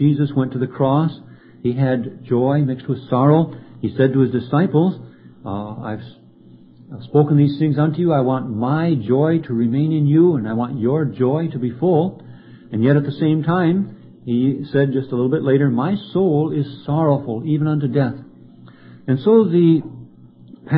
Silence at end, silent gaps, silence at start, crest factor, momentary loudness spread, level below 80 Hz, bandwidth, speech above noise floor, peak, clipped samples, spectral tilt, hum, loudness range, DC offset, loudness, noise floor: 0 s; none; 0 s; 16 dB; 13 LU; -56 dBFS; 4.8 kHz; 28 dB; -2 dBFS; under 0.1%; -13.5 dB/octave; none; 3 LU; under 0.1%; -18 LUFS; -45 dBFS